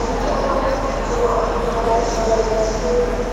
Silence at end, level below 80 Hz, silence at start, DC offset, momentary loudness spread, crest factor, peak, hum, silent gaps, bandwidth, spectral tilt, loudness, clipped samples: 0 s; -26 dBFS; 0 s; under 0.1%; 2 LU; 14 dB; -6 dBFS; none; none; 12.5 kHz; -5 dB/octave; -19 LUFS; under 0.1%